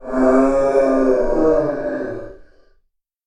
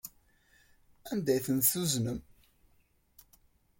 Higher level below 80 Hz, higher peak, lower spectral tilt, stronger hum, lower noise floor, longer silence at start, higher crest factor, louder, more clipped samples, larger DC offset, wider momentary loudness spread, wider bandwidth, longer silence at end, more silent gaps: first, -34 dBFS vs -62 dBFS; first, -2 dBFS vs -12 dBFS; first, -7.5 dB/octave vs -4.5 dB/octave; neither; second, -64 dBFS vs -69 dBFS; about the same, 0 s vs 0.05 s; second, 16 dB vs 24 dB; first, -17 LUFS vs -30 LUFS; neither; neither; second, 11 LU vs 19 LU; second, 10 kHz vs 17 kHz; second, 0.85 s vs 1.6 s; neither